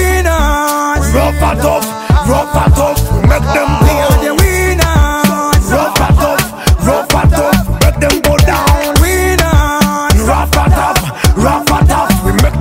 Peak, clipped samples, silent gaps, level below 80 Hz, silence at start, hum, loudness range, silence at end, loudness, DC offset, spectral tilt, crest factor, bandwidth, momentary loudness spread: 0 dBFS; under 0.1%; none; -14 dBFS; 0 s; none; 1 LU; 0 s; -10 LUFS; under 0.1%; -5 dB/octave; 10 dB; 16.5 kHz; 3 LU